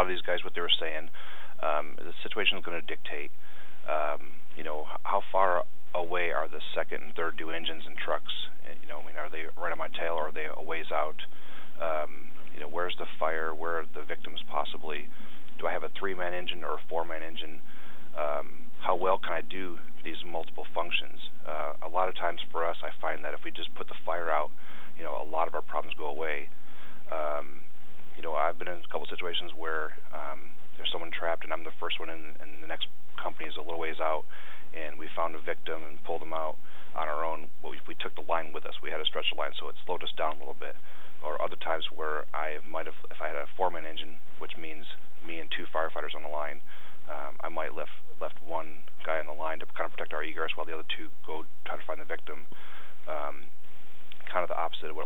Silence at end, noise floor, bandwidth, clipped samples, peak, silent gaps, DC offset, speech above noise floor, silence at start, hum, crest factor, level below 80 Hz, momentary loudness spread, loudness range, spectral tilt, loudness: 0 s; -57 dBFS; over 20 kHz; under 0.1%; -8 dBFS; none; 8%; 22 dB; 0 s; none; 24 dB; -74 dBFS; 15 LU; 5 LU; -5.5 dB/octave; -34 LUFS